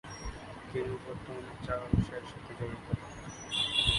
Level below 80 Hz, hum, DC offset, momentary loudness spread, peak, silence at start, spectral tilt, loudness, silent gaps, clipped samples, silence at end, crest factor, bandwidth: -46 dBFS; none; under 0.1%; 13 LU; -12 dBFS; 0.05 s; -4.5 dB/octave; -36 LUFS; none; under 0.1%; 0 s; 22 dB; 11.5 kHz